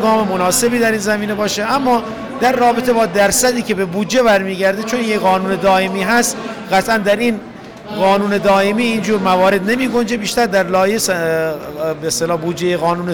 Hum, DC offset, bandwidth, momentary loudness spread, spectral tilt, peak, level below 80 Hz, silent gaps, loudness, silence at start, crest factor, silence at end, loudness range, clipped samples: none; 0.3%; over 20 kHz; 6 LU; -4 dB/octave; -6 dBFS; -46 dBFS; none; -15 LUFS; 0 s; 10 dB; 0 s; 1 LU; under 0.1%